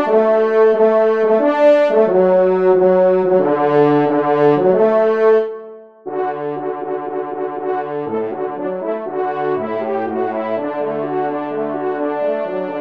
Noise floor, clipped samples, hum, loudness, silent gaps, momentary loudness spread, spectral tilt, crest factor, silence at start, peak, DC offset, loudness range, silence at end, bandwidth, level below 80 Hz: -35 dBFS; under 0.1%; none; -16 LUFS; none; 10 LU; -8.5 dB/octave; 14 dB; 0 s; -2 dBFS; 0.2%; 9 LU; 0 s; 6 kHz; -66 dBFS